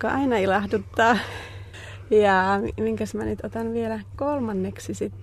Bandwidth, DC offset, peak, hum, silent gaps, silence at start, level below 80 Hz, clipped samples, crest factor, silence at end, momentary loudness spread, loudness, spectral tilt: 13.5 kHz; under 0.1%; -6 dBFS; none; none; 0 s; -48 dBFS; under 0.1%; 18 dB; 0 s; 15 LU; -24 LUFS; -6 dB/octave